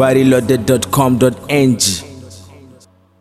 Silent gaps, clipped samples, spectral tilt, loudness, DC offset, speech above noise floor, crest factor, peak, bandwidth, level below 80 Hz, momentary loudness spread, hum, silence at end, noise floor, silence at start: none; under 0.1%; -5 dB/octave; -13 LUFS; under 0.1%; 34 dB; 14 dB; 0 dBFS; 15 kHz; -44 dBFS; 4 LU; none; 0.8 s; -46 dBFS; 0 s